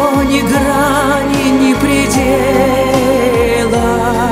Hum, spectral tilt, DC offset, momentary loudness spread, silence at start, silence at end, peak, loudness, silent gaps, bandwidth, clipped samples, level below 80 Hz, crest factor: none; -5 dB/octave; under 0.1%; 2 LU; 0 s; 0 s; 0 dBFS; -11 LUFS; none; 16.5 kHz; under 0.1%; -28 dBFS; 10 dB